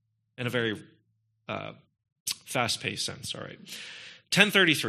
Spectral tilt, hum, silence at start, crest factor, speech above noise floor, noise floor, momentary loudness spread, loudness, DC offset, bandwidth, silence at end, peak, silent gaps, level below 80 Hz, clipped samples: -3 dB/octave; none; 0.4 s; 28 dB; 44 dB; -73 dBFS; 20 LU; -28 LUFS; under 0.1%; 14.5 kHz; 0 s; -2 dBFS; 2.12-2.26 s; -70 dBFS; under 0.1%